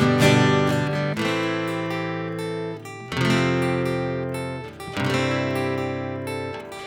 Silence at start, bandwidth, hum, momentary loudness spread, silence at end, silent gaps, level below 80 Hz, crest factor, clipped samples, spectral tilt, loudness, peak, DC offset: 0 s; 19 kHz; none; 12 LU; 0 s; none; -54 dBFS; 18 dB; under 0.1%; -6 dB/octave; -24 LUFS; -4 dBFS; under 0.1%